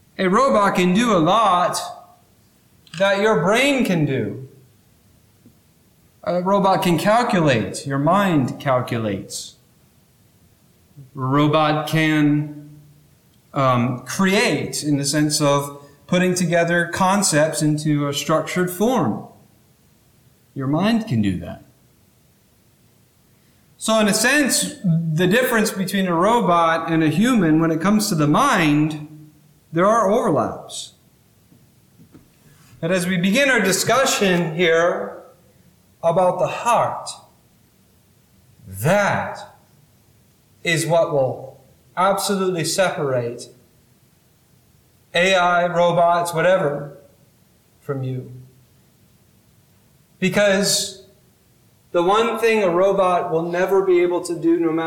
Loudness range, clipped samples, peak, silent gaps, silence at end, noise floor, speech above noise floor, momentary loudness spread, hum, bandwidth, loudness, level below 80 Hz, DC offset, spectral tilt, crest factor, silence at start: 7 LU; under 0.1%; -6 dBFS; none; 0 s; -56 dBFS; 38 dB; 14 LU; none; 19 kHz; -18 LUFS; -56 dBFS; under 0.1%; -4.5 dB/octave; 14 dB; 0.2 s